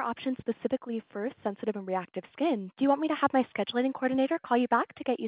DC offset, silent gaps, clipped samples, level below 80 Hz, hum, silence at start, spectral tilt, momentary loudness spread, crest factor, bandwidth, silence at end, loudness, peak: under 0.1%; none; under 0.1%; -72 dBFS; none; 0 s; -3.5 dB/octave; 8 LU; 18 dB; 4 kHz; 0 s; -30 LUFS; -10 dBFS